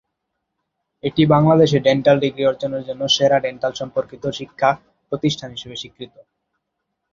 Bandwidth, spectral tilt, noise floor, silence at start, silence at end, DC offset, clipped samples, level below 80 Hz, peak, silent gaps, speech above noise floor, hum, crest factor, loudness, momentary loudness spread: 7.6 kHz; -5.5 dB/octave; -77 dBFS; 1.05 s; 1.05 s; under 0.1%; under 0.1%; -54 dBFS; -2 dBFS; none; 59 dB; none; 18 dB; -18 LUFS; 17 LU